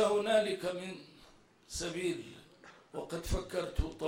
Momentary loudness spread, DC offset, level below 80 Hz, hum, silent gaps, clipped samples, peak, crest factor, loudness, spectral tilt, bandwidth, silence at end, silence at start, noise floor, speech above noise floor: 21 LU; under 0.1%; -46 dBFS; none; none; under 0.1%; -16 dBFS; 18 dB; -36 LUFS; -4.5 dB/octave; 16 kHz; 0 s; 0 s; -61 dBFS; 24 dB